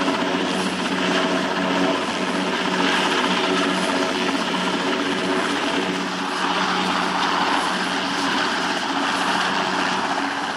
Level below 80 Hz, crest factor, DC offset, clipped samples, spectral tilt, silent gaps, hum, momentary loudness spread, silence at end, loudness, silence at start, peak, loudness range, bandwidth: -64 dBFS; 14 dB; under 0.1%; under 0.1%; -3.5 dB/octave; none; none; 3 LU; 0 s; -21 LUFS; 0 s; -6 dBFS; 1 LU; 15.5 kHz